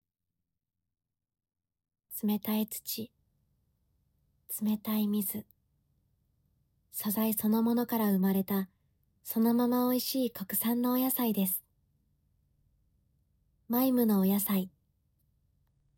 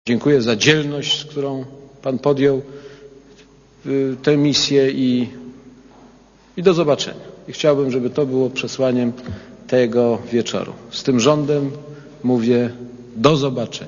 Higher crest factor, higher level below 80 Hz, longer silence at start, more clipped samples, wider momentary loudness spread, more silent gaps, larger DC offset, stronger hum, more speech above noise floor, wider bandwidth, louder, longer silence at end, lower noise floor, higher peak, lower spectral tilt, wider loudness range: about the same, 16 dB vs 18 dB; second, -74 dBFS vs -54 dBFS; first, 2.1 s vs 0.05 s; neither; second, 11 LU vs 19 LU; neither; neither; neither; first, 59 dB vs 31 dB; first, 18 kHz vs 7.4 kHz; second, -30 LUFS vs -18 LUFS; first, 1.3 s vs 0 s; first, -88 dBFS vs -48 dBFS; second, -16 dBFS vs 0 dBFS; about the same, -5.5 dB/octave vs -5 dB/octave; first, 8 LU vs 2 LU